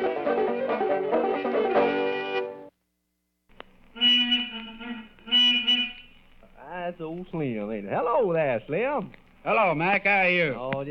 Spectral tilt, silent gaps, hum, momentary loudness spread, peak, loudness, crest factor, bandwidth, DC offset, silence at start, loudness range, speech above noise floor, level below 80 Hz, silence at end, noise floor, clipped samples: -5 dB/octave; none; none; 17 LU; -10 dBFS; -24 LUFS; 18 dB; 6.6 kHz; under 0.1%; 0 s; 5 LU; 51 dB; -58 dBFS; 0 s; -76 dBFS; under 0.1%